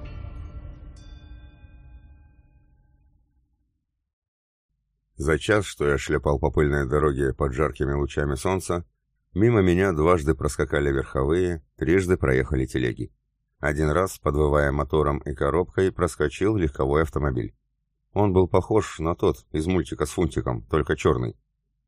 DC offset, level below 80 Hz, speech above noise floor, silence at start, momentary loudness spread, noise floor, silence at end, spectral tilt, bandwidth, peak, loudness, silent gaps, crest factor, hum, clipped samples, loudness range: under 0.1%; -36 dBFS; 53 dB; 0 s; 9 LU; -76 dBFS; 0.55 s; -6.5 dB/octave; 15.5 kHz; -6 dBFS; -24 LUFS; 4.13-4.22 s, 4.28-4.69 s; 20 dB; none; under 0.1%; 3 LU